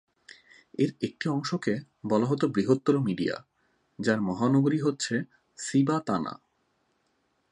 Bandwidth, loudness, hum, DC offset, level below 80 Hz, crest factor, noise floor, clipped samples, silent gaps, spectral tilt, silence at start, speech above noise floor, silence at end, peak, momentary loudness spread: 11 kHz; -28 LUFS; none; under 0.1%; -68 dBFS; 20 dB; -73 dBFS; under 0.1%; none; -6 dB/octave; 0.8 s; 46 dB; 1.15 s; -8 dBFS; 11 LU